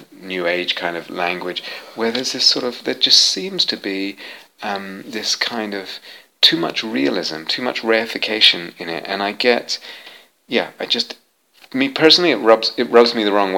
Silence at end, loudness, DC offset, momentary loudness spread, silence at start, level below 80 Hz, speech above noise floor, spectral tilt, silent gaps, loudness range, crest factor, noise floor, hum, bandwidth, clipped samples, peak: 0 s; -17 LUFS; under 0.1%; 16 LU; 0 s; -68 dBFS; 33 dB; -2 dB/octave; none; 4 LU; 18 dB; -51 dBFS; none; 17.5 kHz; under 0.1%; 0 dBFS